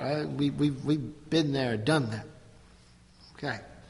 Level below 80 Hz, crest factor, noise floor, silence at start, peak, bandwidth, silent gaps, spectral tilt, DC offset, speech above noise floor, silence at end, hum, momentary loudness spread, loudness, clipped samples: -58 dBFS; 18 dB; -57 dBFS; 0 s; -12 dBFS; 11.5 kHz; none; -6.5 dB/octave; under 0.1%; 28 dB; 0 s; none; 10 LU; -30 LUFS; under 0.1%